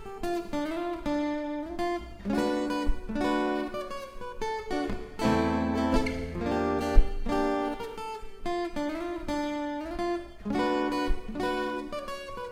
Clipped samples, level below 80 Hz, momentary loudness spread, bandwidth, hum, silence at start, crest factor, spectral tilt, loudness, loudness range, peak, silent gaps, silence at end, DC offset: under 0.1%; -36 dBFS; 9 LU; 15 kHz; none; 0 s; 24 dB; -6 dB/octave; -31 LUFS; 3 LU; -4 dBFS; none; 0 s; under 0.1%